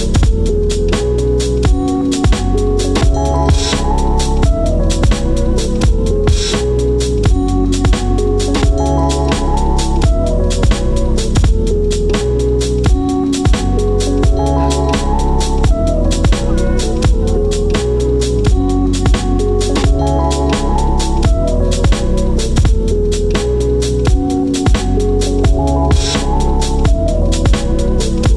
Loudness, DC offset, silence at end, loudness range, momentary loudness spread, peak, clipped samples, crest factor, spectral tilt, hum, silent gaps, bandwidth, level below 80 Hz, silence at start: -14 LUFS; under 0.1%; 0 s; 1 LU; 2 LU; 0 dBFS; under 0.1%; 12 dB; -6 dB/octave; none; none; 12 kHz; -14 dBFS; 0 s